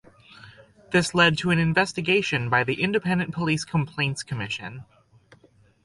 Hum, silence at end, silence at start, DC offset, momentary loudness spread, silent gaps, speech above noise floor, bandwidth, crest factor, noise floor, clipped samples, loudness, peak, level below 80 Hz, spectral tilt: none; 1 s; 0.45 s; under 0.1%; 11 LU; none; 34 dB; 11.5 kHz; 20 dB; -58 dBFS; under 0.1%; -23 LUFS; -6 dBFS; -56 dBFS; -5 dB/octave